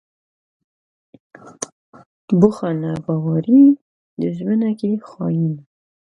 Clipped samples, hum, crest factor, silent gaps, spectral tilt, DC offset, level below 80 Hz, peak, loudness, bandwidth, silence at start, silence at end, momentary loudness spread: under 0.1%; none; 20 dB; 1.72-1.93 s, 2.06-2.28 s, 3.81-4.17 s; -8.5 dB/octave; under 0.1%; -60 dBFS; 0 dBFS; -18 LUFS; 10 kHz; 1.45 s; 0.45 s; 20 LU